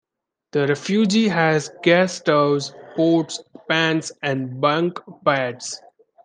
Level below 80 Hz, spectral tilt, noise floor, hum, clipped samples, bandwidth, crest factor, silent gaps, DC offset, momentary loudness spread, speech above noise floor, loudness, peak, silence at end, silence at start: -68 dBFS; -5 dB/octave; -81 dBFS; none; under 0.1%; 10 kHz; 18 dB; none; under 0.1%; 11 LU; 61 dB; -20 LUFS; -2 dBFS; 0.5 s; 0.55 s